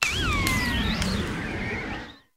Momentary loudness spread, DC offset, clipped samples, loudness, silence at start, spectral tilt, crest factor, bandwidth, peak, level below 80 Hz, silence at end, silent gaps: 9 LU; under 0.1%; under 0.1%; -26 LUFS; 0 s; -4 dB/octave; 26 dB; 16 kHz; 0 dBFS; -36 dBFS; 0.2 s; none